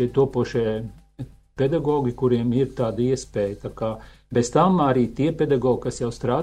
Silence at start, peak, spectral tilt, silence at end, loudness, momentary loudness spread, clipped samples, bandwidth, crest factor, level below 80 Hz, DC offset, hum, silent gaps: 0 s; -4 dBFS; -7 dB/octave; 0 s; -23 LUFS; 12 LU; under 0.1%; 11 kHz; 18 dB; -46 dBFS; under 0.1%; none; none